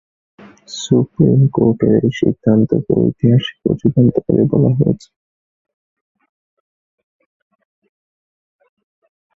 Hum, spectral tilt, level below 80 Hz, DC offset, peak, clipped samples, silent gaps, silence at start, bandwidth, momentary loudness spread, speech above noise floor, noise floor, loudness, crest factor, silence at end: none; -8 dB/octave; -46 dBFS; under 0.1%; 0 dBFS; under 0.1%; none; 0.7 s; 7.6 kHz; 5 LU; over 76 dB; under -90 dBFS; -14 LUFS; 16 dB; 4.4 s